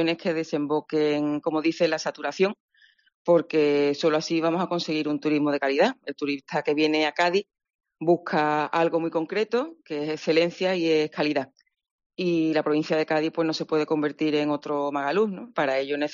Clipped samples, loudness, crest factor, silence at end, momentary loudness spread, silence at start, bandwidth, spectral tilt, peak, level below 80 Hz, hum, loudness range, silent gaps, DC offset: under 0.1%; -25 LUFS; 16 dB; 0 s; 6 LU; 0 s; 7.4 kHz; -3.5 dB/octave; -8 dBFS; -74 dBFS; none; 2 LU; 2.60-2.68 s, 3.14-3.25 s, 7.75-7.79 s, 11.91-11.98 s, 12.06-12.10 s; under 0.1%